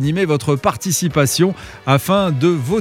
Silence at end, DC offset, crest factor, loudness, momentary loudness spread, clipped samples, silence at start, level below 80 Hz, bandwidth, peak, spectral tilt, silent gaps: 0 s; under 0.1%; 16 dB; -16 LUFS; 4 LU; under 0.1%; 0 s; -46 dBFS; 17 kHz; 0 dBFS; -5 dB/octave; none